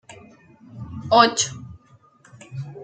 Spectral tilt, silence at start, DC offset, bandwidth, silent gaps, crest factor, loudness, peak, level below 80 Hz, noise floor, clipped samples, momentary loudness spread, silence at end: -3 dB/octave; 0.1 s; under 0.1%; 9.2 kHz; none; 22 dB; -18 LUFS; -2 dBFS; -58 dBFS; -54 dBFS; under 0.1%; 24 LU; 0 s